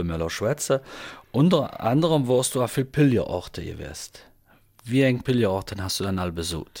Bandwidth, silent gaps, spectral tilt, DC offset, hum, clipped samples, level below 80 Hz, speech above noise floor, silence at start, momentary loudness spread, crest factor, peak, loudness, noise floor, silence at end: 17 kHz; none; -5.5 dB/octave; under 0.1%; none; under 0.1%; -48 dBFS; 34 dB; 0 s; 15 LU; 16 dB; -8 dBFS; -24 LUFS; -58 dBFS; 0 s